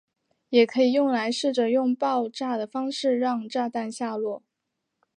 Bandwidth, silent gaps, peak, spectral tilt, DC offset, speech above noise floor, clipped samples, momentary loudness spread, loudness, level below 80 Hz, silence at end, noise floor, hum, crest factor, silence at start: 10 kHz; none; -6 dBFS; -4 dB/octave; under 0.1%; 57 dB; under 0.1%; 9 LU; -25 LUFS; -82 dBFS; 0.8 s; -81 dBFS; none; 20 dB; 0.5 s